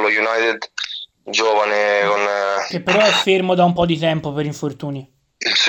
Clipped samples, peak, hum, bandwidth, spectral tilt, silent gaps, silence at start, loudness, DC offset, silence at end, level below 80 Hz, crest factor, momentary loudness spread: under 0.1%; -2 dBFS; none; 16.5 kHz; -4 dB/octave; none; 0 s; -17 LUFS; under 0.1%; 0 s; -54 dBFS; 14 dB; 12 LU